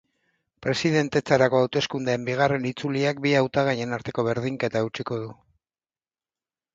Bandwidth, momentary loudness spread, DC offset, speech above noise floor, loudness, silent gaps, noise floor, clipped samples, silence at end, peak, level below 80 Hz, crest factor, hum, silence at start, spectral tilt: 7.8 kHz; 9 LU; under 0.1%; over 66 dB; -24 LUFS; none; under -90 dBFS; under 0.1%; 1.4 s; -4 dBFS; -60 dBFS; 20 dB; none; 0.6 s; -5.5 dB/octave